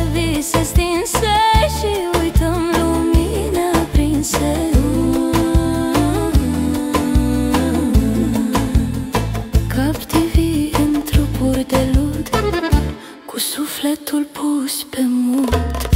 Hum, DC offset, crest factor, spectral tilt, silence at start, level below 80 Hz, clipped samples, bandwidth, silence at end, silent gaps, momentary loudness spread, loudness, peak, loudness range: none; under 0.1%; 14 dB; -5.5 dB/octave; 0 s; -22 dBFS; under 0.1%; 16.5 kHz; 0 s; none; 4 LU; -17 LUFS; -2 dBFS; 3 LU